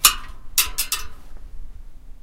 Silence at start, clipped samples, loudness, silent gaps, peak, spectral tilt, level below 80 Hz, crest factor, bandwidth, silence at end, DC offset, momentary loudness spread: 0 s; under 0.1%; -21 LUFS; none; 0 dBFS; 1.5 dB/octave; -36 dBFS; 24 dB; 17 kHz; 0.05 s; under 0.1%; 25 LU